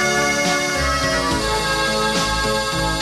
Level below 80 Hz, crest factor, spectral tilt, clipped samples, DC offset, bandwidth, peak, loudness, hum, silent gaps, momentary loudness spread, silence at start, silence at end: -32 dBFS; 12 dB; -3 dB/octave; under 0.1%; under 0.1%; 13.5 kHz; -8 dBFS; -18 LUFS; none; none; 2 LU; 0 s; 0 s